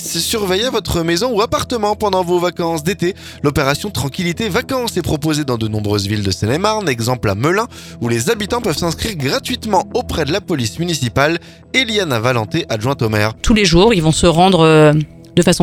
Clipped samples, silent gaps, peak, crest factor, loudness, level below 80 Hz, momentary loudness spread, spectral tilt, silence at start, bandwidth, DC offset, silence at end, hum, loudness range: under 0.1%; none; 0 dBFS; 16 dB; -16 LUFS; -34 dBFS; 8 LU; -5 dB/octave; 0 s; 18 kHz; under 0.1%; 0 s; none; 5 LU